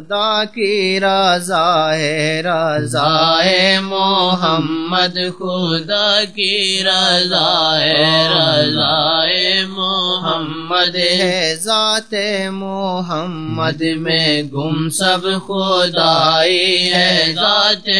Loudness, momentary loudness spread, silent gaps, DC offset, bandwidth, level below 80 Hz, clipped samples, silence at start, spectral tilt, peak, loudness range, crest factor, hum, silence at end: -14 LUFS; 8 LU; none; 0.8%; 11 kHz; -64 dBFS; under 0.1%; 0 s; -3.5 dB/octave; 0 dBFS; 4 LU; 16 dB; none; 0 s